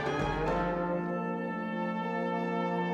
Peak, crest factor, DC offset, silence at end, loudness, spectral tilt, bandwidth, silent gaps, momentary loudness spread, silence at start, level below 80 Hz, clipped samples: -18 dBFS; 14 dB; under 0.1%; 0 s; -32 LUFS; -7.5 dB/octave; 8.4 kHz; none; 3 LU; 0 s; -48 dBFS; under 0.1%